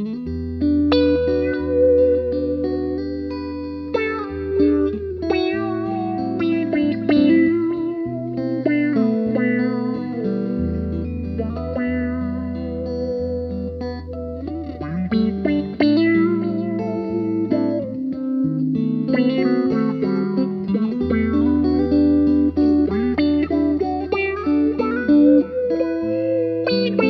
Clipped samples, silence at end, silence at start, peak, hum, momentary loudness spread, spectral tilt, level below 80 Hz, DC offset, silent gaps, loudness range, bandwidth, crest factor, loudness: under 0.1%; 0 s; 0 s; -4 dBFS; none; 10 LU; -9.5 dB/octave; -40 dBFS; under 0.1%; none; 6 LU; 5.8 kHz; 16 dB; -20 LUFS